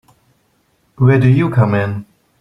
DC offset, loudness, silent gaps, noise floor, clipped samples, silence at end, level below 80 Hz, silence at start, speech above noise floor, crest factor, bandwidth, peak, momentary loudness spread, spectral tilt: under 0.1%; -14 LUFS; none; -60 dBFS; under 0.1%; 0.35 s; -48 dBFS; 1 s; 48 dB; 14 dB; 5.4 kHz; 0 dBFS; 11 LU; -9.5 dB/octave